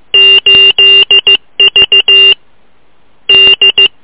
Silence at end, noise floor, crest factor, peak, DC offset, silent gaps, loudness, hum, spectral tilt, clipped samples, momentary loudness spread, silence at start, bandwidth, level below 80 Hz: 0.15 s; -51 dBFS; 6 dB; 0 dBFS; under 0.1%; none; -2 LUFS; none; -5 dB/octave; 0.2%; 5 LU; 0.15 s; 4 kHz; -44 dBFS